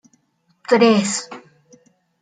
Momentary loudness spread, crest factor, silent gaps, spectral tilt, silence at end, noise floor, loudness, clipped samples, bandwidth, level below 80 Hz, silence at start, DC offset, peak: 23 LU; 18 dB; none; -4 dB/octave; 0.85 s; -64 dBFS; -17 LUFS; under 0.1%; 9.6 kHz; -70 dBFS; 0.7 s; under 0.1%; -2 dBFS